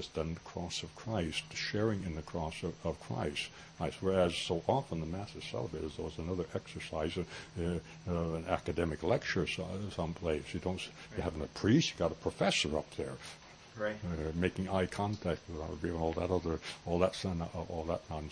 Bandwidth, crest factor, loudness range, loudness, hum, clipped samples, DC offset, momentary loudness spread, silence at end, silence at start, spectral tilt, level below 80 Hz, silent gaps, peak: 10.5 kHz; 22 dB; 4 LU; -36 LUFS; none; under 0.1%; under 0.1%; 10 LU; 0 s; 0 s; -5.5 dB/octave; -54 dBFS; none; -14 dBFS